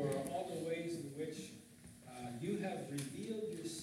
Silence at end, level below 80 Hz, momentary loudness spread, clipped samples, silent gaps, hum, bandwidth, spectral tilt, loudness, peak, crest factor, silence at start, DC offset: 0 s; -74 dBFS; 13 LU; under 0.1%; none; none; 16 kHz; -5.5 dB/octave; -43 LUFS; -26 dBFS; 16 dB; 0 s; under 0.1%